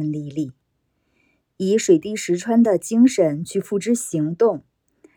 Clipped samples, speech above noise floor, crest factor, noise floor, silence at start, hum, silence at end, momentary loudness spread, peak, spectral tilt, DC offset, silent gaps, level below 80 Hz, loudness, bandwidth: under 0.1%; 51 dB; 16 dB; -70 dBFS; 0 s; none; 0.55 s; 11 LU; -4 dBFS; -6 dB/octave; under 0.1%; none; -66 dBFS; -20 LUFS; 18.5 kHz